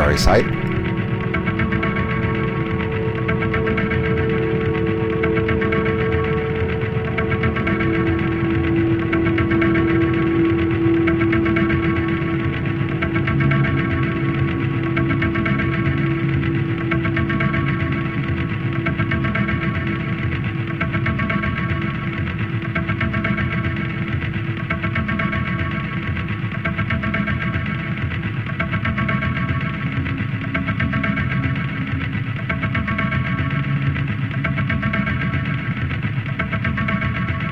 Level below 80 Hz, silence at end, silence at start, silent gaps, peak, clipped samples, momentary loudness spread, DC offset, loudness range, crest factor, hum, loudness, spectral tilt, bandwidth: -34 dBFS; 0 s; 0 s; none; -4 dBFS; under 0.1%; 6 LU; 0.3%; 4 LU; 16 dB; none; -20 LUFS; -7.5 dB/octave; 10 kHz